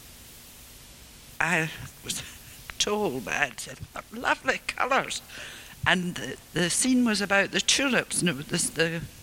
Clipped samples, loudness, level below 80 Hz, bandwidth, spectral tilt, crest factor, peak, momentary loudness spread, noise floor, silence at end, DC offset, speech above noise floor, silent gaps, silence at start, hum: under 0.1%; -26 LUFS; -54 dBFS; 17 kHz; -3 dB/octave; 24 dB; -4 dBFS; 23 LU; -48 dBFS; 0 s; under 0.1%; 21 dB; none; 0 s; none